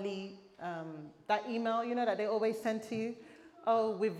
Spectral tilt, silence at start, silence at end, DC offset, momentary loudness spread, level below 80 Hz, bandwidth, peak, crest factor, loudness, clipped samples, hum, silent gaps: -5.5 dB/octave; 0 s; 0 s; under 0.1%; 14 LU; -82 dBFS; 13.5 kHz; -18 dBFS; 18 dB; -35 LUFS; under 0.1%; none; none